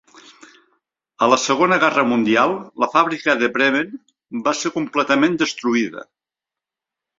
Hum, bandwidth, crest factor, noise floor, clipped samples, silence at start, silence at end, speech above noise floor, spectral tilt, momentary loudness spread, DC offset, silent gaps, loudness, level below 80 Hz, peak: none; 7.8 kHz; 20 dB; -88 dBFS; under 0.1%; 1.2 s; 1.15 s; 70 dB; -3.5 dB/octave; 8 LU; under 0.1%; none; -18 LUFS; -64 dBFS; 0 dBFS